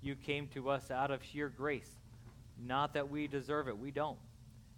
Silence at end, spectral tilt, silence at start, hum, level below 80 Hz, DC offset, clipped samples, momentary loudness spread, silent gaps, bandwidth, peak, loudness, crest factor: 0 s; -6 dB/octave; 0 s; none; -62 dBFS; under 0.1%; under 0.1%; 20 LU; none; 17 kHz; -22 dBFS; -39 LUFS; 18 dB